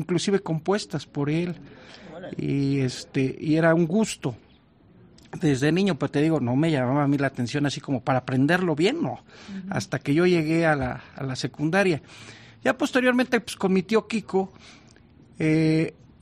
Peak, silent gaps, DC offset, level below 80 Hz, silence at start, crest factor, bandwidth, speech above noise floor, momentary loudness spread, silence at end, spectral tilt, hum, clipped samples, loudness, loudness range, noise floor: -8 dBFS; none; under 0.1%; -58 dBFS; 0 s; 16 dB; 14 kHz; 32 dB; 12 LU; 0.3 s; -6 dB/octave; none; under 0.1%; -24 LUFS; 2 LU; -56 dBFS